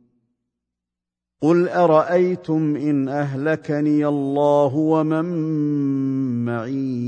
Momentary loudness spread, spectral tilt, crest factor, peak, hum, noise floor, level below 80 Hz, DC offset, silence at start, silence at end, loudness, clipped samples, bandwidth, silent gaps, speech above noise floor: 7 LU; -9 dB/octave; 18 dB; -2 dBFS; 60 Hz at -50 dBFS; -86 dBFS; -68 dBFS; under 0.1%; 1.4 s; 0 s; -20 LUFS; under 0.1%; 8.6 kHz; none; 67 dB